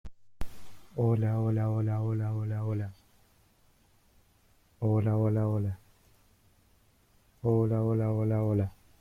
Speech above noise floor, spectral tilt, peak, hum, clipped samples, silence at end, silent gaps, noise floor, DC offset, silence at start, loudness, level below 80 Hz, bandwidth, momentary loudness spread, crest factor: 37 dB; -10.5 dB/octave; -16 dBFS; none; under 0.1%; 0.3 s; none; -65 dBFS; under 0.1%; 0.05 s; -30 LUFS; -54 dBFS; 3.5 kHz; 15 LU; 14 dB